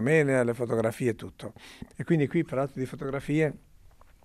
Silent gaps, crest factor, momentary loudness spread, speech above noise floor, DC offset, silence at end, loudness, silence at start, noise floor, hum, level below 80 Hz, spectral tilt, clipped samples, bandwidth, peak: none; 18 dB; 18 LU; 26 dB; under 0.1%; 0.65 s; -28 LUFS; 0 s; -54 dBFS; none; -58 dBFS; -7 dB/octave; under 0.1%; 14 kHz; -10 dBFS